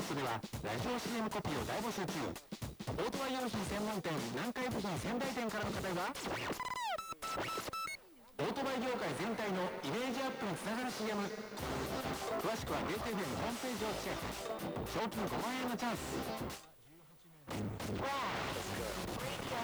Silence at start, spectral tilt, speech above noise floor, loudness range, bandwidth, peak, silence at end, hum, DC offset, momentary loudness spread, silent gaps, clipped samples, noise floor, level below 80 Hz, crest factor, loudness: 0 s; -4.5 dB/octave; 22 dB; 2 LU; over 20 kHz; -26 dBFS; 0 s; none; under 0.1%; 5 LU; none; under 0.1%; -61 dBFS; -58 dBFS; 14 dB; -39 LUFS